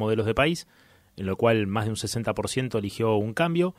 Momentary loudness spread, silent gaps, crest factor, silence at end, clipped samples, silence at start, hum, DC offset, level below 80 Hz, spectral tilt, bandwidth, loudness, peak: 7 LU; none; 18 dB; 0.05 s; under 0.1%; 0 s; none; under 0.1%; -52 dBFS; -5.5 dB/octave; 15.5 kHz; -26 LUFS; -8 dBFS